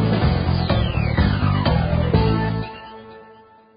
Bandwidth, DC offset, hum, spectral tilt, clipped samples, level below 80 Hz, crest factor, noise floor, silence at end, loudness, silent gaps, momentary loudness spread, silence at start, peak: 5.2 kHz; under 0.1%; none; -12 dB/octave; under 0.1%; -26 dBFS; 16 dB; -48 dBFS; 0.5 s; -20 LUFS; none; 15 LU; 0 s; -4 dBFS